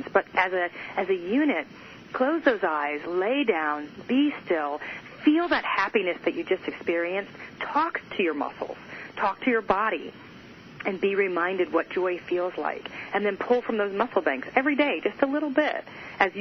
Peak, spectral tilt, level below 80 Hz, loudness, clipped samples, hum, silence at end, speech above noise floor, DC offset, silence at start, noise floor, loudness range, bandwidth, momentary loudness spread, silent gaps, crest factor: -4 dBFS; -6 dB/octave; -64 dBFS; -26 LUFS; under 0.1%; none; 0 s; 20 dB; under 0.1%; 0 s; -46 dBFS; 3 LU; 6.2 kHz; 12 LU; none; 22 dB